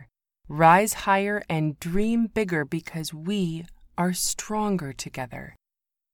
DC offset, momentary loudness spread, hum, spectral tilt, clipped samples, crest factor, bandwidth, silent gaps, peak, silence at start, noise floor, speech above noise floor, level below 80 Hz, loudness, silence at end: under 0.1%; 16 LU; none; -4.5 dB/octave; under 0.1%; 20 dB; 19 kHz; none; -6 dBFS; 0 s; -88 dBFS; 64 dB; -46 dBFS; -25 LUFS; 0.6 s